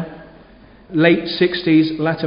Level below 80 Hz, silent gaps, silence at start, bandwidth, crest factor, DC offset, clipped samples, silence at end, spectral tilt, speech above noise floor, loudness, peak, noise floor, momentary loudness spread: -52 dBFS; none; 0 s; 5.4 kHz; 16 dB; under 0.1%; under 0.1%; 0 s; -11 dB/octave; 29 dB; -16 LUFS; 0 dBFS; -45 dBFS; 9 LU